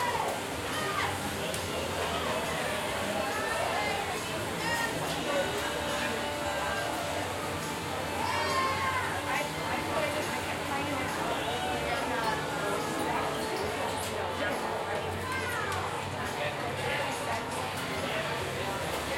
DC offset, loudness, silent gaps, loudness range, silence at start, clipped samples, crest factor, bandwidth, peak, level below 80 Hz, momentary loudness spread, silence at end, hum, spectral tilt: under 0.1%; -31 LUFS; none; 2 LU; 0 s; under 0.1%; 16 dB; 16.5 kHz; -16 dBFS; -56 dBFS; 3 LU; 0 s; none; -3.5 dB/octave